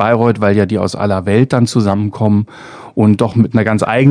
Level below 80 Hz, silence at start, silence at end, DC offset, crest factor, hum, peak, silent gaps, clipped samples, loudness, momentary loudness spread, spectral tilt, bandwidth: -50 dBFS; 0 s; 0 s; under 0.1%; 12 dB; none; 0 dBFS; none; 0.5%; -13 LUFS; 5 LU; -7.5 dB/octave; 10 kHz